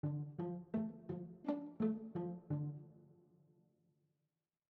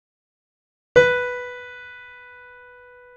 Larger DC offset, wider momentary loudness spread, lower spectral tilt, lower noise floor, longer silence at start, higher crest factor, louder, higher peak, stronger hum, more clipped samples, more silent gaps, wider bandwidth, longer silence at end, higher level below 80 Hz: neither; second, 8 LU vs 25 LU; first, -10.5 dB/octave vs -4 dB/octave; first, under -90 dBFS vs -47 dBFS; second, 0.05 s vs 0.95 s; second, 18 dB vs 24 dB; second, -44 LUFS vs -19 LUFS; second, -26 dBFS vs -2 dBFS; neither; neither; neither; second, 4.7 kHz vs 7.8 kHz; first, 1.55 s vs 1.05 s; second, -80 dBFS vs -54 dBFS